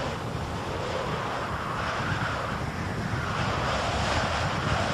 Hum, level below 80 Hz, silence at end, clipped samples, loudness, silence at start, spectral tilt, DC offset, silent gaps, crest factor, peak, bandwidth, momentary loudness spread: none; -42 dBFS; 0 s; under 0.1%; -29 LUFS; 0 s; -5 dB/octave; under 0.1%; none; 16 dB; -14 dBFS; 14.5 kHz; 5 LU